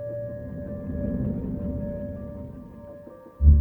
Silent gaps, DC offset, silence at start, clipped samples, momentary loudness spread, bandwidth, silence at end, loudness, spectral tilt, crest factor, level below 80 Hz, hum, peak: none; under 0.1%; 0 s; under 0.1%; 17 LU; 2 kHz; 0 s; -29 LUFS; -12.5 dB/octave; 20 dB; -30 dBFS; none; -6 dBFS